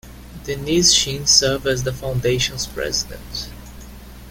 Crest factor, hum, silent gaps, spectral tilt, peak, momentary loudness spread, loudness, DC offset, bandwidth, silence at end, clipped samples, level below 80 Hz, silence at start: 20 dB; 60 Hz at -35 dBFS; none; -2.5 dB/octave; 0 dBFS; 18 LU; -17 LUFS; under 0.1%; 17 kHz; 0 s; under 0.1%; -38 dBFS; 0.05 s